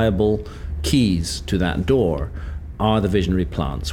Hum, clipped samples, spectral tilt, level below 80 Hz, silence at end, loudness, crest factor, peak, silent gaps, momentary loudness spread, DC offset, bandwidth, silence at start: none; under 0.1%; -6 dB/octave; -30 dBFS; 0 s; -21 LUFS; 16 dB; -4 dBFS; none; 10 LU; under 0.1%; 17 kHz; 0 s